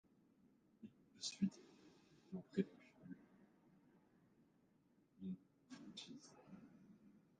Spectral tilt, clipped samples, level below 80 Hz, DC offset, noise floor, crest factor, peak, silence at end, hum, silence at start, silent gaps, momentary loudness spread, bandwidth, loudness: -5 dB/octave; under 0.1%; -86 dBFS; under 0.1%; -77 dBFS; 26 dB; -26 dBFS; 0.2 s; none; 0.8 s; none; 22 LU; 9 kHz; -50 LUFS